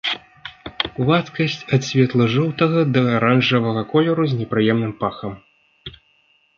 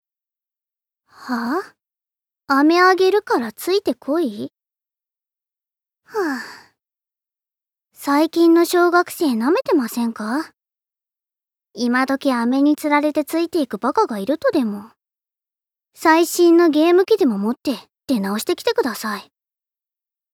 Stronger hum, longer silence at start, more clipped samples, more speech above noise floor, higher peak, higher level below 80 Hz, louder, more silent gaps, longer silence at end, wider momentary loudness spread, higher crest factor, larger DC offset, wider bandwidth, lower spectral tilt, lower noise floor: neither; second, 0.05 s vs 1.2 s; neither; second, 42 dB vs 71 dB; about the same, -2 dBFS vs -2 dBFS; first, -54 dBFS vs -72 dBFS; about the same, -19 LUFS vs -18 LUFS; neither; second, 0.7 s vs 1.1 s; first, 19 LU vs 13 LU; about the same, 18 dB vs 18 dB; neither; second, 7.2 kHz vs 17.5 kHz; first, -6.5 dB/octave vs -4.5 dB/octave; second, -60 dBFS vs -88 dBFS